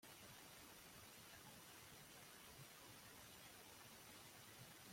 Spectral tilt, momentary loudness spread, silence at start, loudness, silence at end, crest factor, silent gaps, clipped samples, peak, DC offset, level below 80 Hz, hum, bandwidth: -2.5 dB/octave; 0 LU; 0 s; -60 LUFS; 0 s; 16 dB; none; under 0.1%; -46 dBFS; under 0.1%; -82 dBFS; none; 16.5 kHz